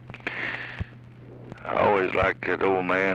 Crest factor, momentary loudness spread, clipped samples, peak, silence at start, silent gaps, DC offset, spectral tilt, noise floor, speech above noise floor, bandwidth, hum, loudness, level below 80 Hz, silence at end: 16 dB; 19 LU; under 0.1%; -10 dBFS; 0 s; none; under 0.1%; -7 dB/octave; -45 dBFS; 21 dB; 8.6 kHz; none; -25 LUFS; -48 dBFS; 0 s